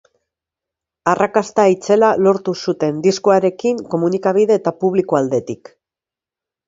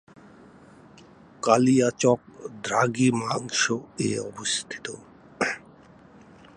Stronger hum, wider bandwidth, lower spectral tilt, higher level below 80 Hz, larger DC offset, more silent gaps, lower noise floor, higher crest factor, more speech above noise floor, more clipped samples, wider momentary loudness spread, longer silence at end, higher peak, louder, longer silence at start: neither; second, 7.8 kHz vs 11 kHz; first, -6 dB/octave vs -4 dB/octave; about the same, -62 dBFS vs -66 dBFS; neither; neither; first, -89 dBFS vs -51 dBFS; second, 16 dB vs 24 dB; first, 73 dB vs 27 dB; neither; second, 7 LU vs 15 LU; first, 1.15 s vs 1 s; first, 0 dBFS vs -4 dBFS; first, -16 LUFS vs -24 LUFS; second, 1.05 s vs 1.45 s